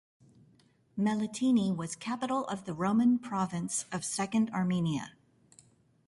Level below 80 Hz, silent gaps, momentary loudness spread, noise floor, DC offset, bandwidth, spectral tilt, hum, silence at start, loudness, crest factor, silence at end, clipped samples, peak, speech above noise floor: -68 dBFS; none; 9 LU; -65 dBFS; under 0.1%; 11.5 kHz; -5.5 dB/octave; none; 0.95 s; -31 LUFS; 14 dB; 1 s; under 0.1%; -18 dBFS; 35 dB